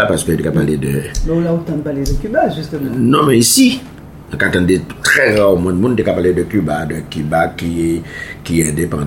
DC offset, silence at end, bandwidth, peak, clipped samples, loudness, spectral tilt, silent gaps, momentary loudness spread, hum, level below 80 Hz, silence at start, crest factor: under 0.1%; 0 s; 17 kHz; 0 dBFS; under 0.1%; -14 LUFS; -4.5 dB/octave; none; 11 LU; none; -30 dBFS; 0 s; 14 dB